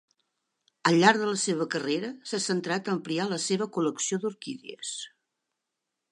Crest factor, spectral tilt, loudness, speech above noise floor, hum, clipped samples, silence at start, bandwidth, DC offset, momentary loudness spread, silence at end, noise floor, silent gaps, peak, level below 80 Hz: 24 dB; -4 dB/octave; -27 LUFS; 57 dB; none; under 0.1%; 0.85 s; 11.5 kHz; under 0.1%; 15 LU; 1.05 s; -84 dBFS; none; -4 dBFS; -80 dBFS